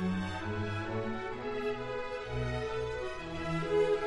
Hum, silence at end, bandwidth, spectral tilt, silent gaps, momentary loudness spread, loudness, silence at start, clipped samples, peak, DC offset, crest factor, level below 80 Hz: none; 0 s; 11 kHz; -6.5 dB/octave; none; 6 LU; -36 LUFS; 0 s; under 0.1%; -20 dBFS; under 0.1%; 14 dB; -50 dBFS